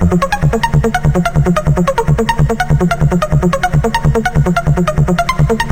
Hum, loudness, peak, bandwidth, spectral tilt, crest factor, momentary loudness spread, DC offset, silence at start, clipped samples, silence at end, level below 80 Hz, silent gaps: none; -13 LUFS; 0 dBFS; 16.5 kHz; -6.5 dB/octave; 12 dB; 1 LU; under 0.1%; 0 s; under 0.1%; 0 s; -20 dBFS; none